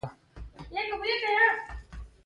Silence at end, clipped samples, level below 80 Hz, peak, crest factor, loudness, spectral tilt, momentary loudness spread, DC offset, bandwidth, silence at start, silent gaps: 0.15 s; under 0.1%; -48 dBFS; -10 dBFS; 20 dB; -27 LUFS; -4.5 dB/octave; 22 LU; under 0.1%; 11 kHz; 0.05 s; none